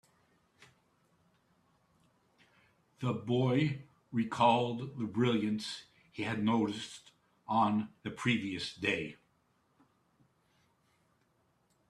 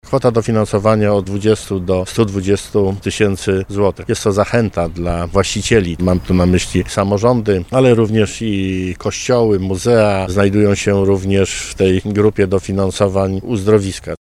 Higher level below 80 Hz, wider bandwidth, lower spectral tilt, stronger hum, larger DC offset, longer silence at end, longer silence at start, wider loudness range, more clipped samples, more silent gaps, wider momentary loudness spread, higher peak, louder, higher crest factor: second, -74 dBFS vs -34 dBFS; second, 11.5 kHz vs 14 kHz; about the same, -6 dB/octave vs -6 dB/octave; neither; neither; first, 2.75 s vs 0.1 s; first, 3 s vs 0.05 s; first, 8 LU vs 2 LU; neither; neither; first, 16 LU vs 5 LU; second, -14 dBFS vs 0 dBFS; second, -33 LUFS vs -15 LUFS; first, 22 dB vs 14 dB